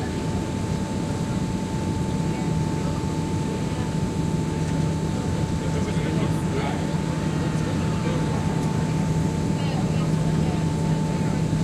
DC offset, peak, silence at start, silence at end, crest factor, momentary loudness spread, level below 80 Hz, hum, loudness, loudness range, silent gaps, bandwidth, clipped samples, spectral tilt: under 0.1%; -10 dBFS; 0 s; 0 s; 12 dB; 3 LU; -40 dBFS; none; -25 LUFS; 2 LU; none; 12.5 kHz; under 0.1%; -6.5 dB/octave